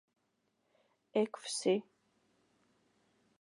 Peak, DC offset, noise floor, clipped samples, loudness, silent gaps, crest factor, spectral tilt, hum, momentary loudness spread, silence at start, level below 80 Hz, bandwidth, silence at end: -20 dBFS; under 0.1%; -80 dBFS; under 0.1%; -36 LUFS; none; 20 dB; -4 dB/octave; none; 3 LU; 1.15 s; under -90 dBFS; 11 kHz; 1.6 s